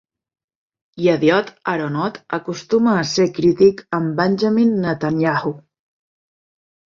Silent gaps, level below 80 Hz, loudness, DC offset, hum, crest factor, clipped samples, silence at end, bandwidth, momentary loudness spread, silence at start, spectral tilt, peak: none; -58 dBFS; -18 LUFS; under 0.1%; none; 18 dB; under 0.1%; 1.35 s; 7.6 kHz; 9 LU; 0.95 s; -6 dB/octave; -2 dBFS